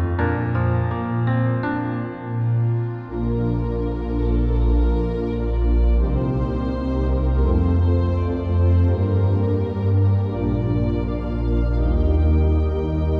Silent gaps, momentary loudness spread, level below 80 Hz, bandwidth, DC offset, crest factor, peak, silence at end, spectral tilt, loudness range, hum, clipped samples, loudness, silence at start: none; 6 LU; -24 dBFS; 5 kHz; under 0.1%; 12 dB; -8 dBFS; 0 s; -10.5 dB/octave; 3 LU; none; under 0.1%; -21 LUFS; 0 s